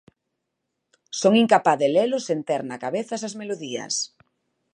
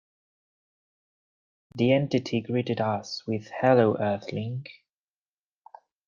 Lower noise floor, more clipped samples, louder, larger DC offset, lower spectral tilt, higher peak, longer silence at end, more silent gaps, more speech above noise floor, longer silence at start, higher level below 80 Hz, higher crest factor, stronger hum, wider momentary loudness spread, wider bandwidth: second, -79 dBFS vs under -90 dBFS; neither; first, -23 LUFS vs -26 LUFS; neither; second, -4 dB/octave vs -7 dB/octave; first, -2 dBFS vs -8 dBFS; second, 0.65 s vs 1.35 s; neither; second, 58 dB vs over 65 dB; second, 1.1 s vs 1.75 s; second, -76 dBFS vs -70 dBFS; about the same, 22 dB vs 20 dB; neither; about the same, 13 LU vs 13 LU; first, 11 kHz vs 7.2 kHz